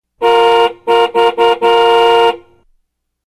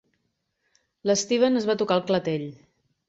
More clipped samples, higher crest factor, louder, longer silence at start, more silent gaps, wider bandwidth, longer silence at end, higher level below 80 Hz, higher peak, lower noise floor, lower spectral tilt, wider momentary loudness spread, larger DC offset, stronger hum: neither; second, 12 dB vs 18 dB; first, -10 LUFS vs -24 LUFS; second, 0.2 s vs 1.05 s; neither; first, 13.5 kHz vs 8 kHz; first, 0.9 s vs 0.55 s; first, -56 dBFS vs -66 dBFS; first, 0 dBFS vs -8 dBFS; second, -64 dBFS vs -76 dBFS; second, -3 dB/octave vs -4.5 dB/octave; second, 4 LU vs 10 LU; first, 0.3% vs under 0.1%; neither